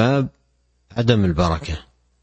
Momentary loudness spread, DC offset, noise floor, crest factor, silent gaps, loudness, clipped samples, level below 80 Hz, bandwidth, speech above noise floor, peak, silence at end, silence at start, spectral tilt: 13 LU; under 0.1%; -64 dBFS; 18 dB; none; -21 LUFS; under 0.1%; -36 dBFS; 8.4 kHz; 45 dB; -2 dBFS; 0.4 s; 0 s; -7 dB/octave